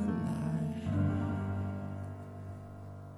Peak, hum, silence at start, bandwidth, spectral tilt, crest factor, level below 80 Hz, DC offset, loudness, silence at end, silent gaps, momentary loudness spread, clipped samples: -22 dBFS; none; 0 s; 11.5 kHz; -9 dB/octave; 14 dB; -58 dBFS; under 0.1%; -36 LUFS; 0 s; none; 14 LU; under 0.1%